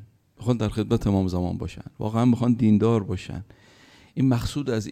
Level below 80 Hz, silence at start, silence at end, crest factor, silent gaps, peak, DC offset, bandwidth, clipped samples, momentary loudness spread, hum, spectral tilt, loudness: -44 dBFS; 0 s; 0 s; 16 dB; none; -8 dBFS; under 0.1%; 14.5 kHz; under 0.1%; 13 LU; none; -8 dB/octave; -24 LUFS